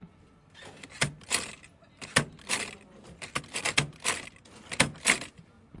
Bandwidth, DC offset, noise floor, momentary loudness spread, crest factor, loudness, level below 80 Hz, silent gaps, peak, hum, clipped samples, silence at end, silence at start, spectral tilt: 12 kHz; under 0.1%; -58 dBFS; 21 LU; 30 dB; -29 LUFS; -58 dBFS; none; -2 dBFS; none; under 0.1%; 0 s; 0 s; -2 dB/octave